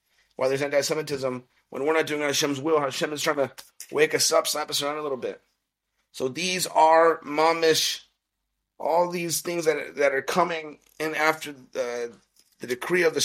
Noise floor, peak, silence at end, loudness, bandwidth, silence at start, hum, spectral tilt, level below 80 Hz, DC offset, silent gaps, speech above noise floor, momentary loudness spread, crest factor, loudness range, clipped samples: -80 dBFS; -6 dBFS; 0 s; -24 LUFS; 16 kHz; 0.4 s; none; -2.5 dB/octave; -74 dBFS; under 0.1%; none; 56 dB; 13 LU; 20 dB; 4 LU; under 0.1%